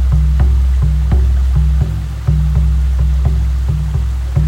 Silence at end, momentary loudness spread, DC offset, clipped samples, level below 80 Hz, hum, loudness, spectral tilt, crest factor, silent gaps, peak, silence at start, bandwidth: 0 s; 4 LU; under 0.1%; under 0.1%; -12 dBFS; none; -15 LUFS; -8 dB/octave; 10 dB; none; -2 dBFS; 0 s; 7.8 kHz